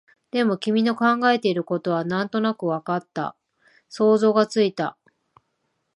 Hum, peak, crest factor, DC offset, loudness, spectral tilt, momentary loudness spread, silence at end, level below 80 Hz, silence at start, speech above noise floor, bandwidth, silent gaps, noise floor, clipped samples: none; -4 dBFS; 18 dB; under 0.1%; -22 LUFS; -6 dB/octave; 11 LU; 1.05 s; -74 dBFS; 0.35 s; 52 dB; 11 kHz; none; -74 dBFS; under 0.1%